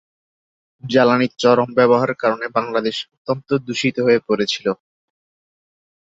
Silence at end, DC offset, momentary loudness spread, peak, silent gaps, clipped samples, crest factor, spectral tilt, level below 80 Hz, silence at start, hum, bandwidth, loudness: 1.3 s; under 0.1%; 10 LU; -2 dBFS; 3.17-3.25 s; under 0.1%; 18 dB; -5.5 dB/octave; -62 dBFS; 0.85 s; none; 7.8 kHz; -18 LUFS